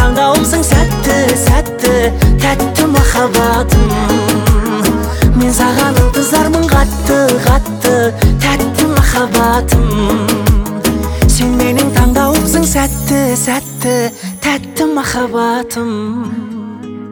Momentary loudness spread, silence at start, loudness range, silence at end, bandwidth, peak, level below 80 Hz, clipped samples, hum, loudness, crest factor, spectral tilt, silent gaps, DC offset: 5 LU; 0 s; 3 LU; 0 s; over 20 kHz; 0 dBFS; -18 dBFS; under 0.1%; none; -12 LUFS; 10 dB; -5 dB/octave; none; under 0.1%